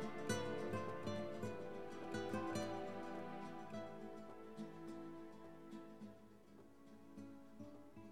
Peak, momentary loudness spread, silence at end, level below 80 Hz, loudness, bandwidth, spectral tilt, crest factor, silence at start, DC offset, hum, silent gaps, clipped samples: -28 dBFS; 16 LU; 0 s; -74 dBFS; -49 LUFS; 16.5 kHz; -5.5 dB/octave; 20 dB; 0 s; 0.1%; none; none; under 0.1%